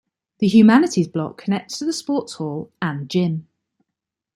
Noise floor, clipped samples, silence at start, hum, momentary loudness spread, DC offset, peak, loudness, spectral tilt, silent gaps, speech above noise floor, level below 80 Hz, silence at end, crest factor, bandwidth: -83 dBFS; under 0.1%; 0.4 s; none; 15 LU; under 0.1%; -2 dBFS; -19 LUFS; -6 dB/octave; none; 65 dB; -64 dBFS; 0.95 s; 18 dB; 12 kHz